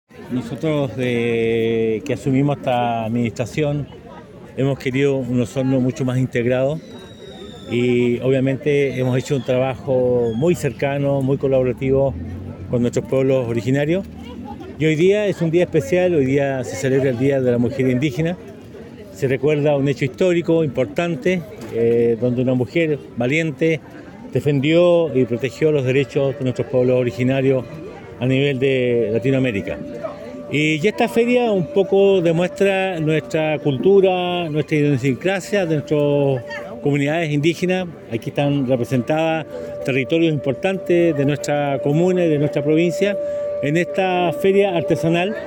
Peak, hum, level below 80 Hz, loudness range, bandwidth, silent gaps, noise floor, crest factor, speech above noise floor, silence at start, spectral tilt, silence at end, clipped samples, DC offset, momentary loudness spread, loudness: -4 dBFS; none; -52 dBFS; 3 LU; 17 kHz; none; -38 dBFS; 14 dB; 20 dB; 0.15 s; -7 dB/octave; 0 s; under 0.1%; under 0.1%; 10 LU; -19 LUFS